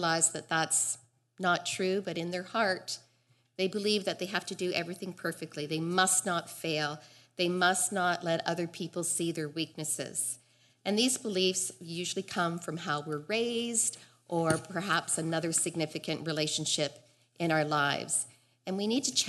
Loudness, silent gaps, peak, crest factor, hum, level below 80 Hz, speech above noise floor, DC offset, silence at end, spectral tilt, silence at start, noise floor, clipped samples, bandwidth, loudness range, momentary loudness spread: -31 LUFS; none; -12 dBFS; 20 dB; none; -76 dBFS; 38 dB; under 0.1%; 0 s; -2.5 dB/octave; 0 s; -70 dBFS; under 0.1%; 12 kHz; 3 LU; 9 LU